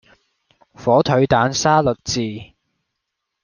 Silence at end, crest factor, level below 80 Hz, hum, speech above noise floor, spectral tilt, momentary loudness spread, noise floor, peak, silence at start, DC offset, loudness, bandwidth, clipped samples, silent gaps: 1 s; 18 dB; -48 dBFS; none; 62 dB; -5 dB/octave; 11 LU; -78 dBFS; -2 dBFS; 0.8 s; under 0.1%; -17 LUFS; 10 kHz; under 0.1%; none